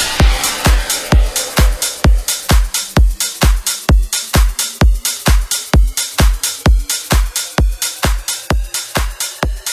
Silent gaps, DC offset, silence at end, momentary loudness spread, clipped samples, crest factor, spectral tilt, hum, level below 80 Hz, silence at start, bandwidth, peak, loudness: none; under 0.1%; 0 s; 4 LU; under 0.1%; 14 dB; -3.5 dB/octave; none; -14 dBFS; 0 s; 16 kHz; 0 dBFS; -15 LUFS